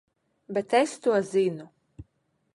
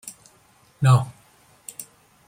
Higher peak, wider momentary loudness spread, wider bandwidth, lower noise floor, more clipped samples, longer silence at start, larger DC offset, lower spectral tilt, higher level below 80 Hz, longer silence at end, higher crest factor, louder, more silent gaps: second, -10 dBFS vs -4 dBFS; second, 9 LU vs 23 LU; second, 11.5 kHz vs 16 kHz; first, -73 dBFS vs -57 dBFS; neither; first, 0.5 s vs 0.05 s; neither; about the same, -5 dB/octave vs -6 dB/octave; about the same, -62 dBFS vs -62 dBFS; about the same, 0.5 s vs 0.45 s; about the same, 18 dB vs 20 dB; second, -26 LUFS vs -20 LUFS; neither